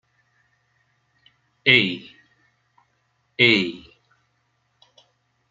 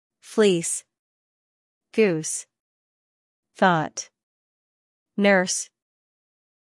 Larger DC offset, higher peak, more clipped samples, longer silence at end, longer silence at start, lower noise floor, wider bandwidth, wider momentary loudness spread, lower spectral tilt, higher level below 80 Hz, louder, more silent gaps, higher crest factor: neither; first, 0 dBFS vs -6 dBFS; neither; first, 1.75 s vs 1 s; first, 1.65 s vs 0.25 s; second, -69 dBFS vs under -90 dBFS; second, 7.6 kHz vs 12 kHz; first, 21 LU vs 15 LU; about the same, -5 dB/octave vs -4 dB/octave; first, -66 dBFS vs -78 dBFS; first, -18 LUFS vs -23 LUFS; second, none vs 0.99-1.81 s, 2.60-3.43 s, 4.23-5.06 s; first, 26 dB vs 20 dB